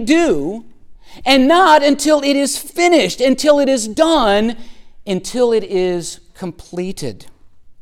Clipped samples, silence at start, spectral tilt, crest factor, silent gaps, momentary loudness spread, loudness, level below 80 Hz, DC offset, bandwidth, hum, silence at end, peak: under 0.1%; 0 s; -3.5 dB/octave; 14 dB; none; 18 LU; -14 LUFS; -42 dBFS; under 0.1%; 17 kHz; none; 0 s; 0 dBFS